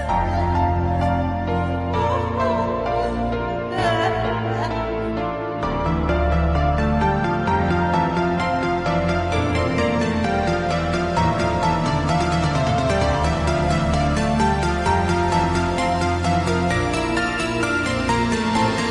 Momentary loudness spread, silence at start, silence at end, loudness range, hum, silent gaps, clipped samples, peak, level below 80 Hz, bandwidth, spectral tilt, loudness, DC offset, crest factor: 3 LU; 0 s; 0 s; 2 LU; none; none; under 0.1%; -6 dBFS; -32 dBFS; 11.5 kHz; -6 dB/octave; -21 LUFS; under 0.1%; 14 dB